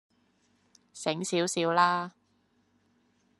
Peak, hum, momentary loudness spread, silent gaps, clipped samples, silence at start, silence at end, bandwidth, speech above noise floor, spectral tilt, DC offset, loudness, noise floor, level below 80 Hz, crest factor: -10 dBFS; none; 10 LU; none; under 0.1%; 0.95 s; 1.3 s; 12 kHz; 43 dB; -3.5 dB/octave; under 0.1%; -28 LUFS; -70 dBFS; -80 dBFS; 22 dB